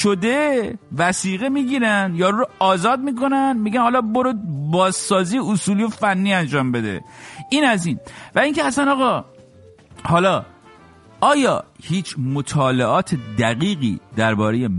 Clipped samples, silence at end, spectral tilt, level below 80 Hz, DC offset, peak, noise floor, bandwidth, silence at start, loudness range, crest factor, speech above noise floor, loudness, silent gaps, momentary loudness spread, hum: under 0.1%; 0 s; -5 dB/octave; -54 dBFS; under 0.1%; -2 dBFS; -47 dBFS; 11.5 kHz; 0 s; 2 LU; 16 dB; 28 dB; -19 LUFS; none; 7 LU; none